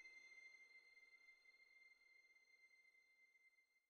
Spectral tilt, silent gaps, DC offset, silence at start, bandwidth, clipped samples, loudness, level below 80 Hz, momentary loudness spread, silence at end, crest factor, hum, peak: 1.5 dB/octave; none; under 0.1%; 0 s; 8.4 kHz; under 0.1%; -66 LUFS; under -90 dBFS; 7 LU; 0 s; 16 dB; none; -54 dBFS